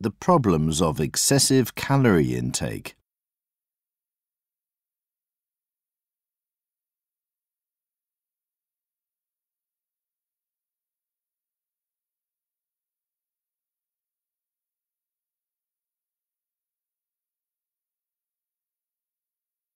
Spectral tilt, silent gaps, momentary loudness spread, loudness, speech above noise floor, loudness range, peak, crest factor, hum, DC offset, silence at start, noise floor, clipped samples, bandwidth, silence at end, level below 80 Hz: -4.5 dB/octave; none; 11 LU; -21 LUFS; over 69 dB; 14 LU; -6 dBFS; 24 dB; none; under 0.1%; 0 s; under -90 dBFS; under 0.1%; 16 kHz; 16.85 s; -52 dBFS